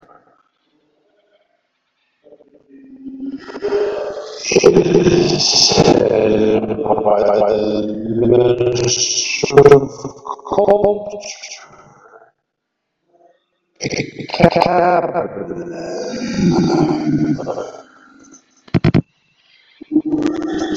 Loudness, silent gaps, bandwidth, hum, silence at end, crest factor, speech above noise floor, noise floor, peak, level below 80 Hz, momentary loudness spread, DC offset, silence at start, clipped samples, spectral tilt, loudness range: -15 LUFS; none; 7.8 kHz; none; 0 s; 16 dB; 61 dB; -75 dBFS; 0 dBFS; -44 dBFS; 18 LU; under 0.1%; 2.9 s; 0.3%; -4.5 dB/octave; 10 LU